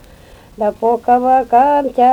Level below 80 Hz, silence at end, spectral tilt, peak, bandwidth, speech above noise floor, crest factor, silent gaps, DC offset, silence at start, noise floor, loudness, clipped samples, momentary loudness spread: -46 dBFS; 0 s; -6.5 dB/octave; 0 dBFS; 10 kHz; 29 dB; 12 dB; none; under 0.1%; 0.6 s; -41 dBFS; -13 LUFS; under 0.1%; 7 LU